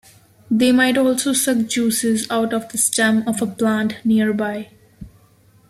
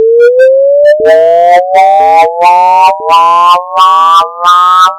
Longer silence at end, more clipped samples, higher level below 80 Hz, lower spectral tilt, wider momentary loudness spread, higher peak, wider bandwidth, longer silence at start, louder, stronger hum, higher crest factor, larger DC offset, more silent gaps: first, 0.6 s vs 0 s; second, under 0.1% vs 9%; about the same, -56 dBFS vs -54 dBFS; first, -3.5 dB/octave vs -1.5 dB/octave; first, 7 LU vs 2 LU; about the same, 0 dBFS vs 0 dBFS; about the same, 15.5 kHz vs 16.5 kHz; first, 0.5 s vs 0 s; second, -18 LUFS vs -5 LUFS; neither; first, 18 dB vs 4 dB; neither; neither